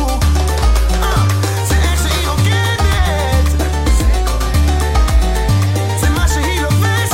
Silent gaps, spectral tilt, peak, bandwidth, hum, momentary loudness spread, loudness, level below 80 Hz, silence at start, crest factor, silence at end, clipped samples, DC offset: none; -5 dB/octave; -2 dBFS; 16.5 kHz; none; 2 LU; -14 LUFS; -16 dBFS; 0 s; 10 dB; 0 s; under 0.1%; under 0.1%